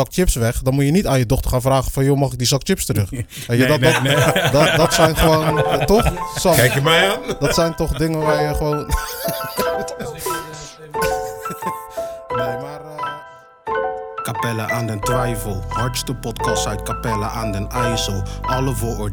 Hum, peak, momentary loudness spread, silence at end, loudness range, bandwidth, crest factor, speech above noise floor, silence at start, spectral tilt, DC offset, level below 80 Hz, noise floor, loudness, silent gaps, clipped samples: none; 0 dBFS; 13 LU; 0 s; 10 LU; 19.5 kHz; 18 dB; 23 dB; 0 s; -4.5 dB/octave; under 0.1%; -30 dBFS; -40 dBFS; -19 LUFS; none; under 0.1%